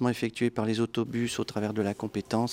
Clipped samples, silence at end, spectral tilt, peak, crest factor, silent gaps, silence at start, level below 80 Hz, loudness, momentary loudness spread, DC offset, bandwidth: under 0.1%; 0 s; -5.5 dB/octave; -12 dBFS; 16 dB; none; 0 s; -64 dBFS; -30 LUFS; 3 LU; under 0.1%; 16.5 kHz